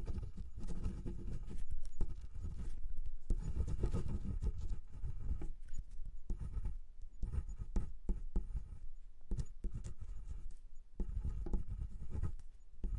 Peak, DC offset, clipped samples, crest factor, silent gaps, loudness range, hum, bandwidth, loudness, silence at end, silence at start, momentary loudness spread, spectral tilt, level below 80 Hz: -20 dBFS; under 0.1%; under 0.1%; 16 dB; none; 4 LU; none; 7.4 kHz; -47 LUFS; 0 s; 0 s; 12 LU; -8 dB/octave; -42 dBFS